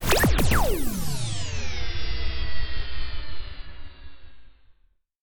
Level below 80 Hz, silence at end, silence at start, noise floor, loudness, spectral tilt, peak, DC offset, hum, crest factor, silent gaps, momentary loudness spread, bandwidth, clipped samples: -30 dBFS; 0 s; 0 s; -63 dBFS; -28 LUFS; -4 dB/octave; -8 dBFS; under 0.1%; none; 16 dB; 5.16-5.20 s; 21 LU; 19 kHz; under 0.1%